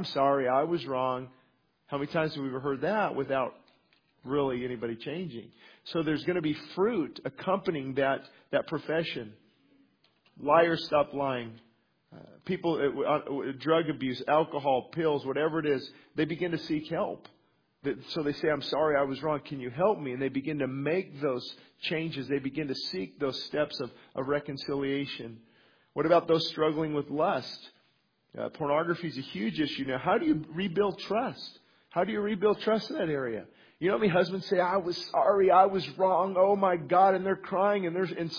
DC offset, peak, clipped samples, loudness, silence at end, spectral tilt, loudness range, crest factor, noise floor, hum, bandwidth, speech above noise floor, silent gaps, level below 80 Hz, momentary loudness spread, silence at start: under 0.1%; -8 dBFS; under 0.1%; -29 LUFS; 0 s; -7 dB/octave; 7 LU; 20 dB; -71 dBFS; none; 5.2 kHz; 42 dB; none; -66 dBFS; 12 LU; 0 s